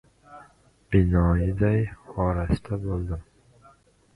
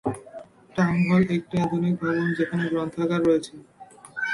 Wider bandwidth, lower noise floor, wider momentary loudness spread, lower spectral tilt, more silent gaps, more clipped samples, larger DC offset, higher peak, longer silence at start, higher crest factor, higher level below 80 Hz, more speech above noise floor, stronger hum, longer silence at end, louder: about the same, 10.5 kHz vs 11.5 kHz; first, -57 dBFS vs -44 dBFS; second, 10 LU vs 18 LU; first, -9.5 dB/octave vs -7.5 dB/octave; neither; neither; neither; first, -6 dBFS vs -10 dBFS; first, 0.3 s vs 0.05 s; about the same, 18 dB vs 14 dB; first, -34 dBFS vs -58 dBFS; first, 34 dB vs 21 dB; neither; first, 0.95 s vs 0 s; about the same, -25 LUFS vs -24 LUFS